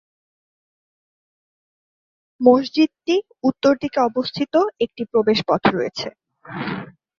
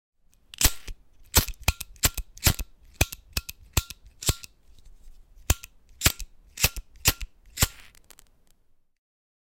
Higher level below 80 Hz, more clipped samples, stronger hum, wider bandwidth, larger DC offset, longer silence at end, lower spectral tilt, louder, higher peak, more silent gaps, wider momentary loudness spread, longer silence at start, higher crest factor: second, -58 dBFS vs -36 dBFS; neither; neither; second, 7.4 kHz vs 17 kHz; neither; second, 0.35 s vs 1.85 s; first, -6 dB/octave vs -2 dB/octave; first, -20 LUFS vs -26 LUFS; about the same, -2 dBFS vs -4 dBFS; neither; second, 13 LU vs 19 LU; first, 2.4 s vs 0.6 s; second, 20 dB vs 26 dB